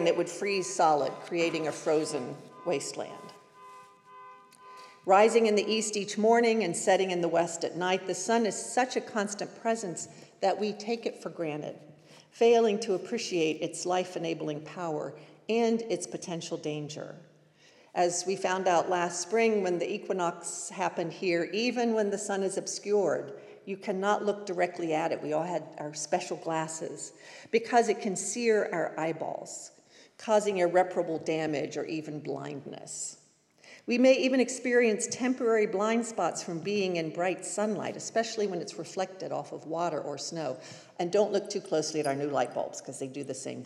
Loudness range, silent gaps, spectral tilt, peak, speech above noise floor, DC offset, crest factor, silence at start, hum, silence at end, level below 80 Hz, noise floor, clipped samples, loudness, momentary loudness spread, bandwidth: 6 LU; none; -4 dB/octave; -10 dBFS; 31 dB; under 0.1%; 20 dB; 0 s; none; 0 s; under -90 dBFS; -60 dBFS; under 0.1%; -30 LUFS; 13 LU; 12.5 kHz